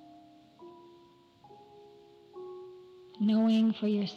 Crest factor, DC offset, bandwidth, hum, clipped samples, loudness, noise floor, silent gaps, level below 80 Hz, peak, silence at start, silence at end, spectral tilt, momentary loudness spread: 14 dB; under 0.1%; 6.6 kHz; none; under 0.1%; -28 LUFS; -60 dBFS; none; -80 dBFS; -20 dBFS; 0.6 s; 0 s; -8 dB/octave; 27 LU